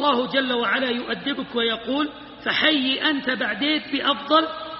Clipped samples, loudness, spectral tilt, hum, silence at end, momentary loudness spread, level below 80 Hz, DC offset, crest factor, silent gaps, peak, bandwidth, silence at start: under 0.1%; -22 LUFS; 0 dB/octave; none; 0 s; 7 LU; -60 dBFS; under 0.1%; 18 dB; none; -4 dBFS; 5.8 kHz; 0 s